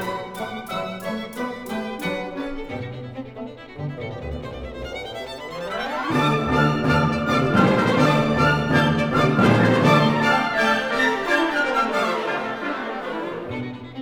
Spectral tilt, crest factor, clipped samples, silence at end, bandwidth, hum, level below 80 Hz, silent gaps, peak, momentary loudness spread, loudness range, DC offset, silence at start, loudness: -6 dB/octave; 18 dB; under 0.1%; 0 s; 19 kHz; none; -44 dBFS; none; -4 dBFS; 15 LU; 13 LU; under 0.1%; 0 s; -21 LUFS